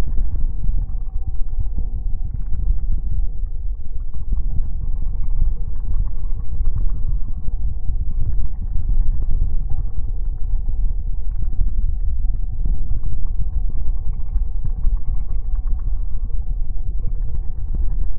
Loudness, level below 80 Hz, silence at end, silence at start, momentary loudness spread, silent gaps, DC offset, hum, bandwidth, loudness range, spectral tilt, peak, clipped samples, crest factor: -27 LUFS; -18 dBFS; 0 s; 0 s; 4 LU; none; under 0.1%; none; 1.2 kHz; 1 LU; -14 dB/octave; -4 dBFS; under 0.1%; 10 dB